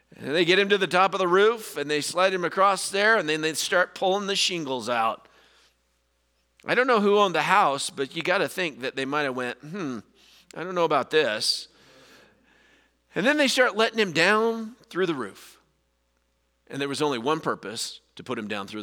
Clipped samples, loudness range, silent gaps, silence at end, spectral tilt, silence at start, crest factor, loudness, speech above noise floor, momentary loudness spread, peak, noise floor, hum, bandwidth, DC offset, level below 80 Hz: under 0.1%; 6 LU; none; 0 s; -3 dB/octave; 0.2 s; 22 dB; -24 LUFS; 47 dB; 13 LU; -4 dBFS; -71 dBFS; none; over 20 kHz; under 0.1%; -74 dBFS